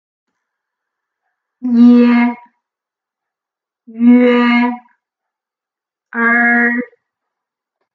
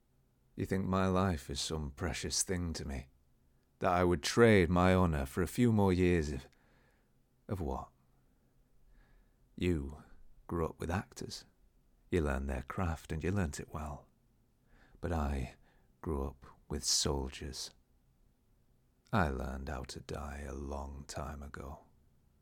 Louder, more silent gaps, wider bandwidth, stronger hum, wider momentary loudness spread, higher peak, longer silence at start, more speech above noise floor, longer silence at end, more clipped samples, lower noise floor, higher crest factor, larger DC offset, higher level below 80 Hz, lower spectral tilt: first, -11 LUFS vs -35 LUFS; neither; second, 4.8 kHz vs 18 kHz; neither; about the same, 17 LU vs 17 LU; first, 0 dBFS vs -12 dBFS; first, 1.6 s vs 0.55 s; first, 78 dB vs 37 dB; first, 1.1 s vs 0.65 s; neither; first, -87 dBFS vs -71 dBFS; second, 14 dB vs 22 dB; neither; second, -76 dBFS vs -48 dBFS; first, -7 dB/octave vs -5 dB/octave